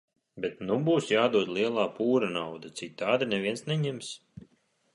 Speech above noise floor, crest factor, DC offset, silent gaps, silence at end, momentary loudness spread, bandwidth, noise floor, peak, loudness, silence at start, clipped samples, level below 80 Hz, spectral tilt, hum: 40 dB; 18 dB; under 0.1%; none; 0.55 s; 14 LU; 11.5 kHz; -68 dBFS; -10 dBFS; -28 LUFS; 0.35 s; under 0.1%; -70 dBFS; -5.5 dB/octave; none